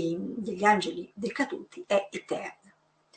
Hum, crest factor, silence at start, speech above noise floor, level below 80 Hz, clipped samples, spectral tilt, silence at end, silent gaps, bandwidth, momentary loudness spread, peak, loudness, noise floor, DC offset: none; 22 dB; 0 s; 34 dB; -74 dBFS; under 0.1%; -5 dB/octave; 0.65 s; none; 9 kHz; 12 LU; -8 dBFS; -29 LUFS; -63 dBFS; under 0.1%